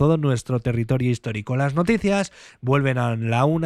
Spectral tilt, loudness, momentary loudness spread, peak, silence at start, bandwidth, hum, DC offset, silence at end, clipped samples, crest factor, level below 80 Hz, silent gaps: -7 dB/octave; -22 LUFS; 6 LU; -6 dBFS; 0 s; 11.5 kHz; none; under 0.1%; 0 s; under 0.1%; 14 dB; -46 dBFS; none